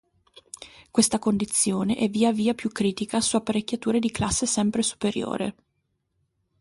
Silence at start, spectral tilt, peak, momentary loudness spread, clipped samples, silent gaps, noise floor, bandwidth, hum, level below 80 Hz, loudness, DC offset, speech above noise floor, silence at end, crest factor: 0.6 s; -4 dB/octave; -8 dBFS; 8 LU; under 0.1%; none; -75 dBFS; 11.5 kHz; none; -52 dBFS; -24 LUFS; under 0.1%; 50 dB; 1.1 s; 18 dB